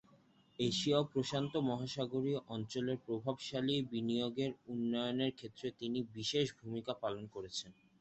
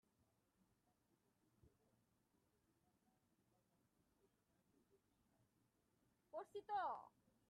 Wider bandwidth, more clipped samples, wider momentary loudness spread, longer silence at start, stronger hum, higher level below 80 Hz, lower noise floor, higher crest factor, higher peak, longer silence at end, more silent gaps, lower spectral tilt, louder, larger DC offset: second, 8.2 kHz vs 10 kHz; neither; about the same, 9 LU vs 11 LU; second, 0.6 s vs 1.65 s; neither; first, -72 dBFS vs under -90 dBFS; second, -68 dBFS vs -84 dBFS; about the same, 18 dB vs 22 dB; first, -20 dBFS vs -36 dBFS; about the same, 0.3 s vs 0.4 s; neither; about the same, -5.5 dB/octave vs -4.5 dB/octave; first, -38 LUFS vs -50 LUFS; neither